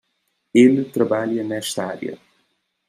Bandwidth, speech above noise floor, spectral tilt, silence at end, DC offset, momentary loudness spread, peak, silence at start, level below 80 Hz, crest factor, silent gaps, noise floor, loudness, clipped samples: 15 kHz; 53 dB; -5.5 dB/octave; 0.75 s; under 0.1%; 14 LU; -2 dBFS; 0.55 s; -70 dBFS; 18 dB; none; -71 dBFS; -19 LUFS; under 0.1%